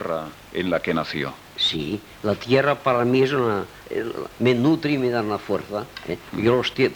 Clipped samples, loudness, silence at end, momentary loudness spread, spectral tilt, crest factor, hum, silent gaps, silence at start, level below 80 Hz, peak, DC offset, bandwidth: under 0.1%; -23 LUFS; 0 s; 11 LU; -6 dB/octave; 18 dB; none; none; 0 s; -54 dBFS; -4 dBFS; under 0.1%; over 20 kHz